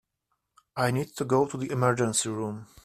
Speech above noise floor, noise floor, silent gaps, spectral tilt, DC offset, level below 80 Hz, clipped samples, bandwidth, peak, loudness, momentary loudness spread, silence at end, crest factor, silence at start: 52 dB; -79 dBFS; none; -5 dB/octave; under 0.1%; -62 dBFS; under 0.1%; 15 kHz; -8 dBFS; -27 LUFS; 9 LU; 0.2 s; 20 dB; 0.75 s